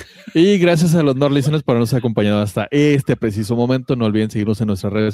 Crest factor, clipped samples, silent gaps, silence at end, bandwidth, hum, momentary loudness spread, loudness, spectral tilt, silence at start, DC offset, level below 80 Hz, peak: 14 dB; under 0.1%; none; 0 s; 15.5 kHz; none; 6 LU; -16 LUFS; -7 dB/octave; 0 s; under 0.1%; -52 dBFS; -2 dBFS